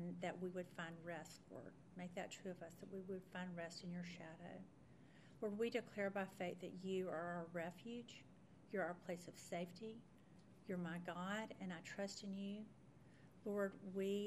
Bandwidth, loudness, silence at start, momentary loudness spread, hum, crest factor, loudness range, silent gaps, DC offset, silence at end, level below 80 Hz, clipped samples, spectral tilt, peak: 13 kHz; -49 LUFS; 0 s; 17 LU; none; 20 dB; 5 LU; none; under 0.1%; 0 s; -82 dBFS; under 0.1%; -5.5 dB/octave; -28 dBFS